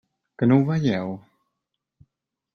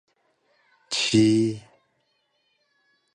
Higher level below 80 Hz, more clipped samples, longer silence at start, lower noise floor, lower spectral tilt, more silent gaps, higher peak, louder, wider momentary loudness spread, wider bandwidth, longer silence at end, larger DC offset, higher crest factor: about the same, -62 dBFS vs -62 dBFS; neither; second, 0.4 s vs 0.9 s; first, -82 dBFS vs -71 dBFS; first, -8.5 dB/octave vs -4.5 dB/octave; neither; about the same, -6 dBFS vs -8 dBFS; about the same, -22 LUFS vs -22 LUFS; first, 14 LU vs 11 LU; second, 6.6 kHz vs 10.5 kHz; second, 1.35 s vs 1.55 s; neither; about the same, 18 dB vs 20 dB